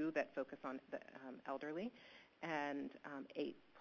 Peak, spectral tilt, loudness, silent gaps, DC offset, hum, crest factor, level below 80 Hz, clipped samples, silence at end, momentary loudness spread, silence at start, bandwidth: -26 dBFS; -3.5 dB/octave; -47 LUFS; none; under 0.1%; none; 20 dB; -86 dBFS; under 0.1%; 0 s; 10 LU; 0 s; 6.8 kHz